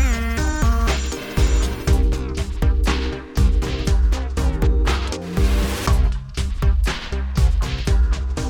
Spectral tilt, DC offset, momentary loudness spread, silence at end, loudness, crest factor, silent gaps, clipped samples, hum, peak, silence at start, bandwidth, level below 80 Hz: -5.5 dB/octave; under 0.1%; 5 LU; 0 s; -21 LUFS; 14 dB; none; under 0.1%; none; -6 dBFS; 0 s; 19 kHz; -20 dBFS